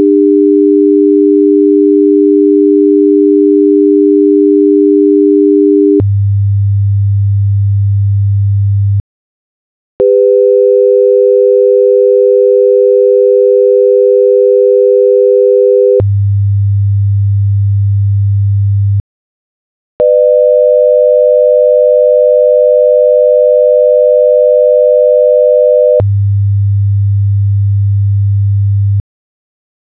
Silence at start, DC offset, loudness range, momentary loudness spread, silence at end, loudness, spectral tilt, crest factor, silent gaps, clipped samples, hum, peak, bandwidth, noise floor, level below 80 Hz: 0 s; 0.4%; 5 LU; 4 LU; 1 s; -8 LUFS; -15 dB/octave; 8 dB; 9.00-10.00 s, 19.00-20.00 s; under 0.1%; none; 0 dBFS; 2.6 kHz; under -90 dBFS; -28 dBFS